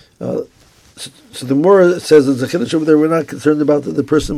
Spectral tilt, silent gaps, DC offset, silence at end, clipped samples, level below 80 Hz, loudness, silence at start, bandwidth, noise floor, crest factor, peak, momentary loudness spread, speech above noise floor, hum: -6 dB/octave; none; under 0.1%; 0 s; under 0.1%; -42 dBFS; -14 LUFS; 0.2 s; 14.5 kHz; -41 dBFS; 14 dB; 0 dBFS; 19 LU; 28 dB; none